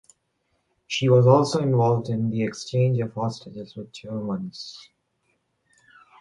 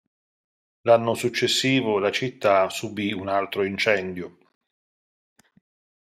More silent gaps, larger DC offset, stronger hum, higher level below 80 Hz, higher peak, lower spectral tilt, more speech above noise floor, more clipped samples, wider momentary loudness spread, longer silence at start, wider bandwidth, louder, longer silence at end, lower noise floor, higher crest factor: neither; neither; neither; first, -62 dBFS vs -72 dBFS; about the same, -4 dBFS vs -6 dBFS; first, -7 dB/octave vs -4 dB/octave; second, 50 dB vs over 67 dB; neither; first, 20 LU vs 9 LU; about the same, 0.9 s vs 0.85 s; second, 11 kHz vs 15.5 kHz; about the same, -22 LUFS vs -23 LUFS; second, 1.4 s vs 1.75 s; second, -72 dBFS vs under -90 dBFS; about the same, 20 dB vs 20 dB